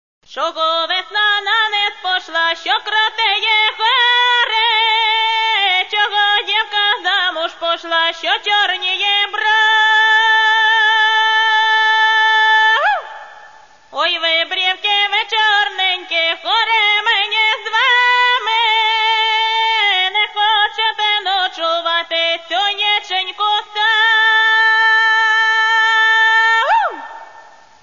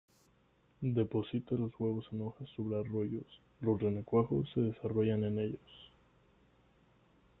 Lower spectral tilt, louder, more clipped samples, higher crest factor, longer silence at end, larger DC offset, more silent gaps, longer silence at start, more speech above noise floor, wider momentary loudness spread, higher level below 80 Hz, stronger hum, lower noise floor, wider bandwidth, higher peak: second, 2 dB/octave vs -10.5 dB/octave; first, -13 LUFS vs -36 LUFS; neither; second, 12 dB vs 20 dB; second, 0.4 s vs 1.55 s; first, 0.3% vs under 0.1%; neither; second, 0.3 s vs 0.8 s; second, 27 dB vs 35 dB; second, 7 LU vs 11 LU; about the same, -64 dBFS vs -66 dBFS; neither; second, -43 dBFS vs -70 dBFS; first, 7.4 kHz vs 4 kHz; first, -4 dBFS vs -18 dBFS